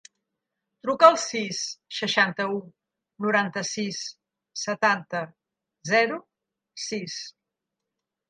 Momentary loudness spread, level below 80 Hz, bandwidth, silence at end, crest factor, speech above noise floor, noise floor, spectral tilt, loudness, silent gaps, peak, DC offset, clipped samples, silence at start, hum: 19 LU; -78 dBFS; 9.6 kHz; 1 s; 26 dB; 60 dB; -85 dBFS; -3 dB/octave; -25 LUFS; none; -2 dBFS; under 0.1%; under 0.1%; 0.85 s; none